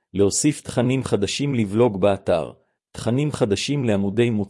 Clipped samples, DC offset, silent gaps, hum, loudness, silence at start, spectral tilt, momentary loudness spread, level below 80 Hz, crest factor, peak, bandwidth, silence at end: under 0.1%; under 0.1%; none; none; -21 LUFS; 0.15 s; -5.5 dB/octave; 6 LU; -56 dBFS; 16 dB; -6 dBFS; 12 kHz; 0 s